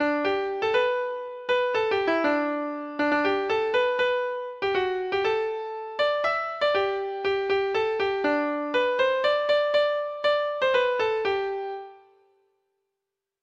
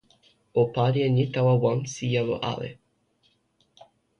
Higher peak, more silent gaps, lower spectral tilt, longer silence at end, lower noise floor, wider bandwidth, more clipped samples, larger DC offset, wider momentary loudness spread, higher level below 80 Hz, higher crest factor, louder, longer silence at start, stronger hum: about the same, -12 dBFS vs -10 dBFS; neither; second, -4.5 dB/octave vs -6.5 dB/octave; about the same, 1.45 s vs 1.45 s; first, -85 dBFS vs -68 dBFS; second, 8 kHz vs 9.2 kHz; neither; neither; about the same, 7 LU vs 9 LU; second, -64 dBFS vs -58 dBFS; about the same, 14 dB vs 16 dB; about the same, -25 LUFS vs -25 LUFS; second, 0 s vs 0.55 s; neither